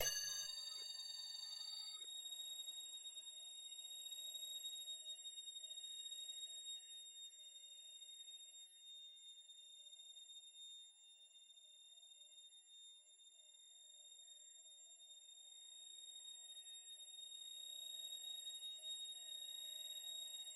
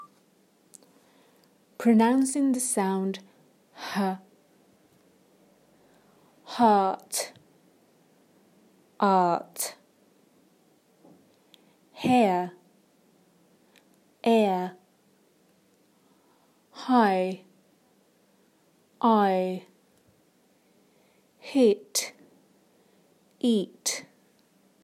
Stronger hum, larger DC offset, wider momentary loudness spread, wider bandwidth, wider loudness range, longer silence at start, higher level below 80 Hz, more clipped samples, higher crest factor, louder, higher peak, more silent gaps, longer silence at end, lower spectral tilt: neither; neither; second, 13 LU vs 16 LU; about the same, 16 kHz vs 16 kHz; first, 11 LU vs 4 LU; about the same, 0 s vs 0 s; second, under -90 dBFS vs -80 dBFS; neither; about the same, 26 dB vs 22 dB; second, -51 LUFS vs -25 LUFS; second, -26 dBFS vs -8 dBFS; neither; second, 0 s vs 0.8 s; second, 3 dB/octave vs -4.5 dB/octave